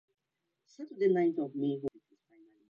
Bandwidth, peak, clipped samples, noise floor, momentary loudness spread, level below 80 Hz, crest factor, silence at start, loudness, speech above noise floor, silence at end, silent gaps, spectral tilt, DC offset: 7 kHz; -18 dBFS; under 0.1%; -85 dBFS; 18 LU; -78 dBFS; 18 dB; 0.8 s; -32 LUFS; 54 dB; 0.8 s; none; -8.5 dB/octave; under 0.1%